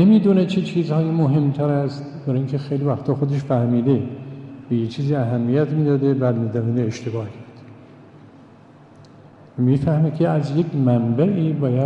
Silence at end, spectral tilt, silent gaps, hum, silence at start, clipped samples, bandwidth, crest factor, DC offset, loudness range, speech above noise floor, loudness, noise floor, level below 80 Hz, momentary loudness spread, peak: 0 s; -9.5 dB/octave; none; none; 0 s; under 0.1%; 8 kHz; 14 dB; under 0.1%; 5 LU; 28 dB; -20 LUFS; -46 dBFS; -56 dBFS; 10 LU; -4 dBFS